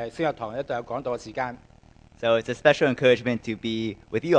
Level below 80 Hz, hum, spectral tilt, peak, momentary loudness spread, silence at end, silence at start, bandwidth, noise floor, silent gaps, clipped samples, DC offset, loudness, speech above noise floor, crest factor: -56 dBFS; none; -5.5 dB/octave; -2 dBFS; 11 LU; 0 s; 0 s; 9.4 kHz; -53 dBFS; none; under 0.1%; under 0.1%; -25 LUFS; 28 dB; 22 dB